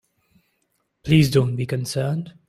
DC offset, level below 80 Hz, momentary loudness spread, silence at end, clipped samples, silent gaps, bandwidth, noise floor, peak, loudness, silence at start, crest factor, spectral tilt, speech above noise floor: under 0.1%; -50 dBFS; 10 LU; 0.2 s; under 0.1%; none; 15.5 kHz; -71 dBFS; -4 dBFS; -21 LUFS; 1.05 s; 18 dB; -6.5 dB/octave; 51 dB